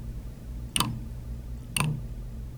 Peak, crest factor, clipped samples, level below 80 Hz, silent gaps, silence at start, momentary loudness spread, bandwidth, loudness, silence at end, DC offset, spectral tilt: -6 dBFS; 26 dB; under 0.1%; -38 dBFS; none; 0 s; 12 LU; over 20 kHz; -32 LUFS; 0 s; under 0.1%; -3.5 dB/octave